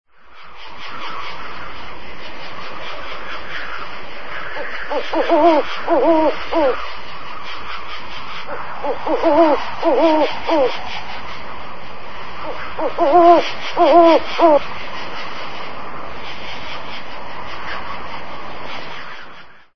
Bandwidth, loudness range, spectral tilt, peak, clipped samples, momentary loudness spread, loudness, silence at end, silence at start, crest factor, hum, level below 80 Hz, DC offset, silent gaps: 6.4 kHz; 15 LU; -5.5 dB/octave; 0 dBFS; under 0.1%; 19 LU; -18 LUFS; 0 s; 0 s; 18 dB; none; -46 dBFS; 8%; none